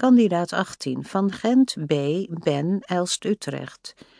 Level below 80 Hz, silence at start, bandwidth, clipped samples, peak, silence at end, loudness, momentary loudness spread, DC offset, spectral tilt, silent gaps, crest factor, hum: -68 dBFS; 0 s; 10.5 kHz; under 0.1%; -6 dBFS; 0.3 s; -23 LUFS; 11 LU; under 0.1%; -5.5 dB/octave; none; 16 dB; none